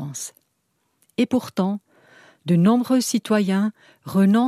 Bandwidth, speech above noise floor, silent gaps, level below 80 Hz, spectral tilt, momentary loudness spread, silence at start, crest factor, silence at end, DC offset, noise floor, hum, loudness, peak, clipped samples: 15 kHz; 52 dB; none; -70 dBFS; -6 dB/octave; 15 LU; 0 s; 16 dB; 0 s; under 0.1%; -71 dBFS; none; -21 LUFS; -6 dBFS; under 0.1%